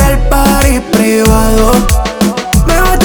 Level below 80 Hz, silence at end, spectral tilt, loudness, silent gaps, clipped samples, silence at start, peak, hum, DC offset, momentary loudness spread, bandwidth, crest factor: -12 dBFS; 0 s; -5 dB/octave; -9 LUFS; none; 0.4%; 0 s; 0 dBFS; none; under 0.1%; 4 LU; over 20 kHz; 8 dB